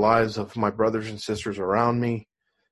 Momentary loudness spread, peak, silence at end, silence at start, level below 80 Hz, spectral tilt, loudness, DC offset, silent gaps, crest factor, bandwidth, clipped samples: 8 LU; -6 dBFS; 0.5 s; 0 s; -54 dBFS; -6.5 dB/octave; -25 LUFS; under 0.1%; none; 18 dB; 12 kHz; under 0.1%